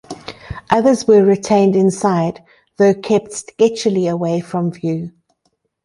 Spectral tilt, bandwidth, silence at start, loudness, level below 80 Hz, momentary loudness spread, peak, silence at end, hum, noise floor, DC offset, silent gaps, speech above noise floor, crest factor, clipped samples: -6 dB/octave; 11.5 kHz; 0.1 s; -15 LUFS; -48 dBFS; 18 LU; -2 dBFS; 0.75 s; none; -67 dBFS; under 0.1%; none; 52 dB; 14 dB; under 0.1%